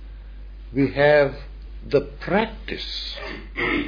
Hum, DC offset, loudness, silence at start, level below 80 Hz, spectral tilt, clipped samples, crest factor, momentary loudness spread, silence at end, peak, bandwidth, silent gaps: none; under 0.1%; -23 LUFS; 0 s; -38 dBFS; -7 dB/octave; under 0.1%; 18 dB; 24 LU; 0 s; -6 dBFS; 5.2 kHz; none